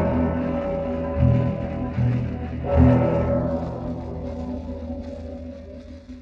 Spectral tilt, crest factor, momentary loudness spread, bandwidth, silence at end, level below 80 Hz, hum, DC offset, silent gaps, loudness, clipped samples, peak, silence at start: -10.5 dB/octave; 18 dB; 17 LU; 6 kHz; 0 s; -36 dBFS; none; under 0.1%; none; -24 LUFS; under 0.1%; -4 dBFS; 0 s